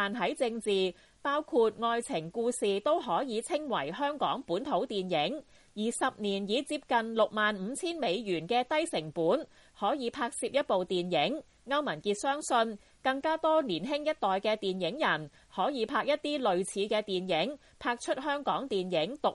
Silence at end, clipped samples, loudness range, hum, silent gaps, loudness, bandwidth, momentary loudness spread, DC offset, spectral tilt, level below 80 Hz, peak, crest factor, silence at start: 0 s; under 0.1%; 1 LU; none; none; -31 LUFS; 11.5 kHz; 6 LU; under 0.1%; -4 dB/octave; -68 dBFS; -14 dBFS; 16 dB; 0 s